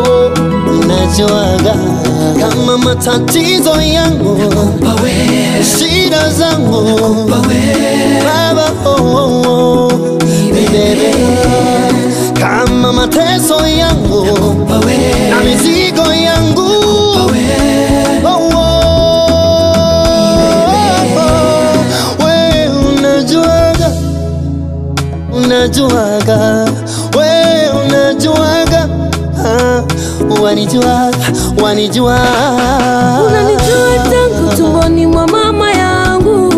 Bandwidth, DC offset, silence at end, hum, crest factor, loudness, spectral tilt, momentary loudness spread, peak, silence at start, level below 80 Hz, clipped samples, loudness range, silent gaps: 15.5 kHz; 0.3%; 0 s; none; 8 dB; -9 LUFS; -5 dB/octave; 3 LU; 0 dBFS; 0 s; -26 dBFS; under 0.1%; 2 LU; none